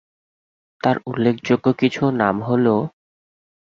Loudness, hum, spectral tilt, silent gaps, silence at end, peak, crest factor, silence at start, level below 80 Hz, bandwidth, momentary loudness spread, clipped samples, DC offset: -19 LUFS; none; -7.5 dB/octave; none; 0.8 s; -2 dBFS; 18 dB; 0.85 s; -58 dBFS; 7.2 kHz; 5 LU; under 0.1%; under 0.1%